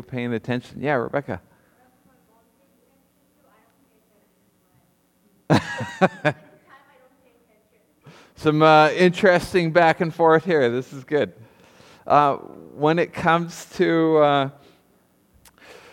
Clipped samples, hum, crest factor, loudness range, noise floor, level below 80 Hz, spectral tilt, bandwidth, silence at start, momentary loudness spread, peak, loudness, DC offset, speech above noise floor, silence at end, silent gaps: under 0.1%; none; 20 dB; 12 LU; -63 dBFS; -58 dBFS; -6.5 dB/octave; 16 kHz; 0.1 s; 13 LU; -2 dBFS; -20 LUFS; under 0.1%; 43 dB; 1.4 s; none